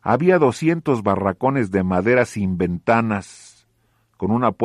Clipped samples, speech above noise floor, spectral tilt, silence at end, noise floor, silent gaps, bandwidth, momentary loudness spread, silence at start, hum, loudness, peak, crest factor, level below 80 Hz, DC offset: under 0.1%; 45 dB; -7.5 dB/octave; 0 s; -64 dBFS; none; 12 kHz; 7 LU; 0.05 s; none; -19 LUFS; -2 dBFS; 16 dB; -54 dBFS; under 0.1%